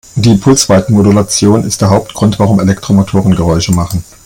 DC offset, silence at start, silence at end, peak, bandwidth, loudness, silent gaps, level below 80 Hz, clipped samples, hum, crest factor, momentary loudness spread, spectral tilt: under 0.1%; 0.15 s; 0.25 s; 0 dBFS; 17 kHz; -9 LUFS; none; -34 dBFS; 0.2%; none; 8 dB; 4 LU; -5.5 dB/octave